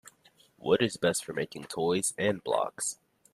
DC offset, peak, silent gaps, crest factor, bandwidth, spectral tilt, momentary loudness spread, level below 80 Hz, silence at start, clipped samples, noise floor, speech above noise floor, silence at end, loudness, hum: under 0.1%; -12 dBFS; none; 20 dB; 14.5 kHz; -3.5 dB/octave; 9 LU; -70 dBFS; 0.05 s; under 0.1%; -63 dBFS; 34 dB; 0.4 s; -30 LUFS; none